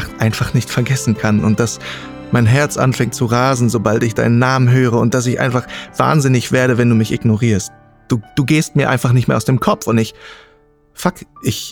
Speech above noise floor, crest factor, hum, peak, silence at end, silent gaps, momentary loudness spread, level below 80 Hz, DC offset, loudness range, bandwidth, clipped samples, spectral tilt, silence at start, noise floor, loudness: 36 dB; 14 dB; none; 0 dBFS; 0 s; none; 9 LU; -44 dBFS; under 0.1%; 3 LU; 18 kHz; under 0.1%; -6 dB/octave; 0 s; -50 dBFS; -15 LUFS